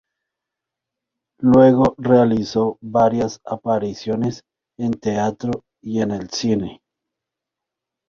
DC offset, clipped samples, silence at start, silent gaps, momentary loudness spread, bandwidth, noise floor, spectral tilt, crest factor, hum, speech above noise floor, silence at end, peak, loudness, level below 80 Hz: under 0.1%; under 0.1%; 1.4 s; none; 14 LU; 7.4 kHz; -84 dBFS; -7 dB/octave; 18 dB; none; 67 dB; 1.35 s; -2 dBFS; -19 LUFS; -50 dBFS